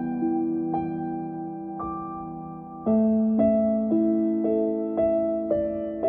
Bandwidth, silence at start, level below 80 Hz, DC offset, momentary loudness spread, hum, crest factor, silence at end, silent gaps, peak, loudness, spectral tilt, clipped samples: 3.4 kHz; 0 s; -54 dBFS; under 0.1%; 13 LU; none; 14 dB; 0 s; none; -10 dBFS; -25 LUFS; -13 dB/octave; under 0.1%